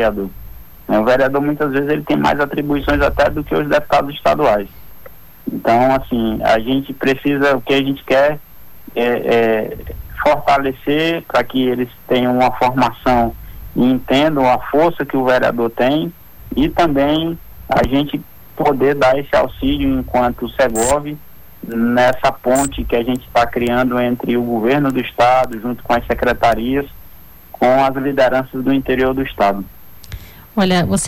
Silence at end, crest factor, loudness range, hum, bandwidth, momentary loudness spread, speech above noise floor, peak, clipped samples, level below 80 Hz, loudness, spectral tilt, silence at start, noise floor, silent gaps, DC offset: 0 s; 10 dB; 1 LU; none; 18.5 kHz; 11 LU; 26 dB; -6 dBFS; under 0.1%; -36 dBFS; -16 LUFS; -5.5 dB/octave; 0 s; -41 dBFS; none; under 0.1%